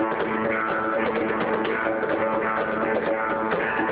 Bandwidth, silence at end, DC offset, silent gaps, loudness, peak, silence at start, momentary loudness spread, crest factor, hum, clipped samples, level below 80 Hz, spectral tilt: 4 kHz; 0 s; under 0.1%; none; -24 LUFS; -8 dBFS; 0 s; 1 LU; 16 dB; none; under 0.1%; -56 dBFS; -9 dB/octave